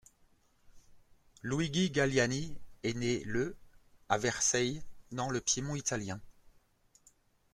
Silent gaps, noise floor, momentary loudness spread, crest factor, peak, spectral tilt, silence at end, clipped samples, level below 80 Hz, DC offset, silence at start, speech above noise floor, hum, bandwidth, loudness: none; -67 dBFS; 14 LU; 22 dB; -12 dBFS; -3.5 dB/octave; 1.05 s; under 0.1%; -58 dBFS; under 0.1%; 0.75 s; 35 dB; none; 14 kHz; -33 LUFS